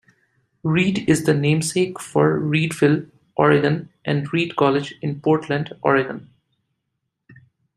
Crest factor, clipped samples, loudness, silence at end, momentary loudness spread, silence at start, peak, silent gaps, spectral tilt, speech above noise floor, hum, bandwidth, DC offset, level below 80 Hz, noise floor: 18 dB; under 0.1%; -20 LUFS; 1.55 s; 8 LU; 0.65 s; -2 dBFS; none; -6 dB/octave; 58 dB; none; 13.5 kHz; under 0.1%; -60 dBFS; -77 dBFS